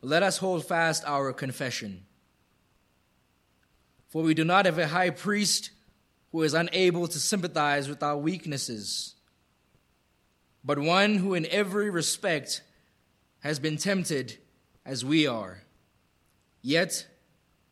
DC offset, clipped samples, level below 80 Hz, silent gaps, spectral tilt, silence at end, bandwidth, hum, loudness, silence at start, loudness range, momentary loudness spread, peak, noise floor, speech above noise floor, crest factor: under 0.1%; under 0.1%; -72 dBFS; none; -4 dB/octave; 0.65 s; 14 kHz; none; -27 LUFS; 0.05 s; 5 LU; 13 LU; -6 dBFS; -69 dBFS; 42 dB; 22 dB